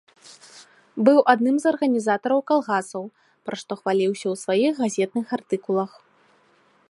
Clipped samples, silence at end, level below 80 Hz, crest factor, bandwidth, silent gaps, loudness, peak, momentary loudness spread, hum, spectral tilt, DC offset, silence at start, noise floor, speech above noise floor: under 0.1%; 1 s; -76 dBFS; 22 dB; 11.5 kHz; none; -22 LUFS; -2 dBFS; 16 LU; none; -5 dB/octave; under 0.1%; 0.55 s; -60 dBFS; 39 dB